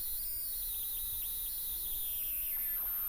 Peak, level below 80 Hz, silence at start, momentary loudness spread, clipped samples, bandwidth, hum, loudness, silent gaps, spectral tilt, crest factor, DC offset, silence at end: -28 dBFS; -54 dBFS; 0 s; 2 LU; under 0.1%; over 20 kHz; none; -34 LUFS; none; 0.5 dB/octave; 10 dB; under 0.1%; 0 s